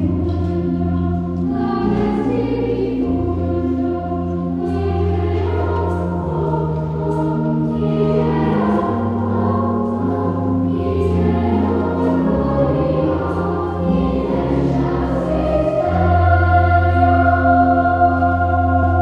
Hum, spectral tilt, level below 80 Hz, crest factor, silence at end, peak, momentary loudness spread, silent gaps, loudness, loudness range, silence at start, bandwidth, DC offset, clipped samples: none; -10 dB/octave; -34 dBFS; 14 dB; 0 s; -2 dBFS; 6 LU; none; -18 LUFS; 5 LU; 0 s; 5.6 kHz; under 0.1%; under 0.1%